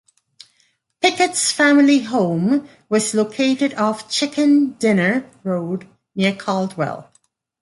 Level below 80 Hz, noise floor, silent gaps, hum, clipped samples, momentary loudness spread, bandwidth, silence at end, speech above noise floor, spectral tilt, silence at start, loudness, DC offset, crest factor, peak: -66 dBFS; -63 dBFS; none; none; under 0.1%; 11 LU; 11.5 kHz; 0.6 s; 45 dB; -4 dB/octave; 1 s; -18 LUFS; under 0.1%; 18 dB; -2 dBFS